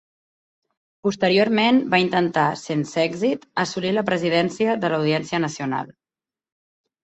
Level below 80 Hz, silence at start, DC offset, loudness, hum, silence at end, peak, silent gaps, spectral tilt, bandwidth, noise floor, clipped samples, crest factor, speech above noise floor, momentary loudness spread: -64 dBFS; 1.05 s; under 0.1%; -21 LUFS; none; 1.1 s; -4 dBFS; none; -5.5 dB/octave; 8.4 kHz; under -90 dBFS; under 0.1%; 18 dB; over 69 dB; 9 LU